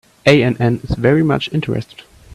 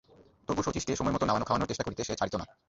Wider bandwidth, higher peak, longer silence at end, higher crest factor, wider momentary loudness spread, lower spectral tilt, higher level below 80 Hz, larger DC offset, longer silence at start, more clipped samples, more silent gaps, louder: first, 13 kHz vs 8 kHz; first, 0 dBFS vs -14 dBFS; first, 0.5 s vs 0.25 s; about the same, 16 dB vs 18 dB; first, 11 LU vs 6 LU; first, -7 dB/octave vs -5 dB/octave; first, -38 dBFS vs -50 dBFS; neither; about the same, 0.25 s vs 0.2 s; neither; neither; first, -15 LUFS vs -31 LUFS